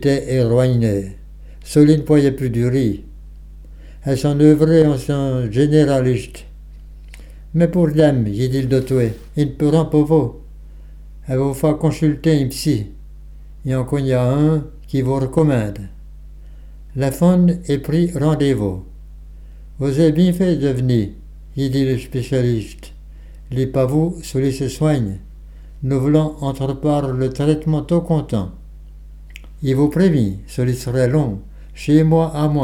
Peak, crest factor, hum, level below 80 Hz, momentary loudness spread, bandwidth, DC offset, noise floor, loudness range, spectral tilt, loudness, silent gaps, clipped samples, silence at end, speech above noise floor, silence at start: 0 dBFS; 18 dB; none; -36 dBFS; 11 LU; 16 kHz; under 0.1%; -36 dBFS; 4 LU; -8 dB/octave; -17 LUFS; none; under 0.1%; 0 s; 20 dB; 0 s